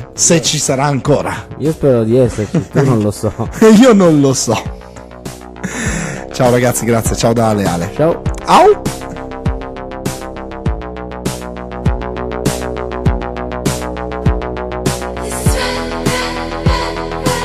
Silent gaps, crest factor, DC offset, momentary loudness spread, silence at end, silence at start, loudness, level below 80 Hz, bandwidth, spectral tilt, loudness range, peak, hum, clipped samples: none; 14 dB; under 0.1%; 15 LU; 0 s; 0 s; -14 LUFS; -26 dBFS; 15 kHz; -5 dB/octave; 9 LU; 0 dBFS; none; under 0.1%